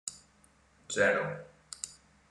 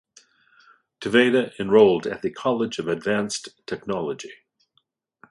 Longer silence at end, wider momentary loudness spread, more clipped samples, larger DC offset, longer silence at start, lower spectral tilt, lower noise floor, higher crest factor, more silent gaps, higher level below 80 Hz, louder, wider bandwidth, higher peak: second, 0.35 s vs 0.95 s; about the same, 17 LU vs 17 LU; neither; neither; second, 0.05 s vs 1 s; second, -3 dB/octave vs -4.5 dB/octave; second, -65 dBFS vs -70 dBFS; about the same, 22 dB vs 20 dB; neither; second, -70 dBFS vs -62 dBFS; second, -32 LUFS vs -22 LUFS; about the same, 12 kHz vs 11.5 kHz; second, -12 dBFS vs -2 dBFS